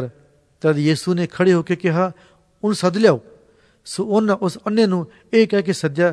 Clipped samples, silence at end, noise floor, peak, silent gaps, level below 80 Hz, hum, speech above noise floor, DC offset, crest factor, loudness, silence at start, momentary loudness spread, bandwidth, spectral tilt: under 0.1%; 0 s; -54 dBFS; 0 dBFS; none; -62 dBFS; none; 36 dB; under 0.1%; 18 dB; -19 LUFS; 0 s; 8 LU; 11 kHz; -6.5 dB/octave